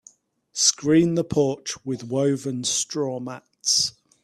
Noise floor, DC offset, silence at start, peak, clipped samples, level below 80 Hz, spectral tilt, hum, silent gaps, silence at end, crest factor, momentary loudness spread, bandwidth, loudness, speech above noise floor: -55 dBFS; under 0.1%; 0.55 s; -4 dBFS; under 0.1%; -60 dBFS; -3.5 dB/octave; none; none; 0.35 s; 20 dB; 11 LU; 14 kHz; -22 LUFS; 32 dB